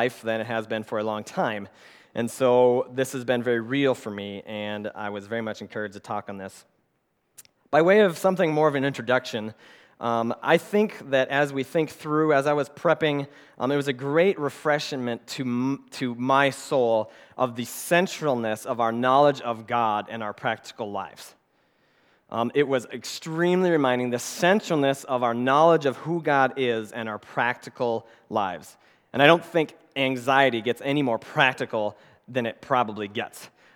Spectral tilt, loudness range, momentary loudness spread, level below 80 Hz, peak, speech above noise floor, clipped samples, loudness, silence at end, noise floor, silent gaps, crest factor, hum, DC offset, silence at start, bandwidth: -5 dB/octave; 6 LU; 13 LU; -76 dBFS; 0 dBFS; 48 dB; under 0.1%; -24 LUFS; 0.3 s; -72 dBFS; none; 24 dB; none; under 0.1%; 0 s; 19 kHz